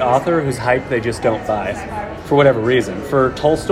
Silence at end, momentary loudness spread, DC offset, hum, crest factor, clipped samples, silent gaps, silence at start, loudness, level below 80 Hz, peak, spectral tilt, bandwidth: 0 s; 10 LU; under 0.1%; none; 16 dB; under 0.1%; none; 0 s; -17 LUFS; -40 dBFS; 0 dBFS; -6 dB/octave; 16 kHz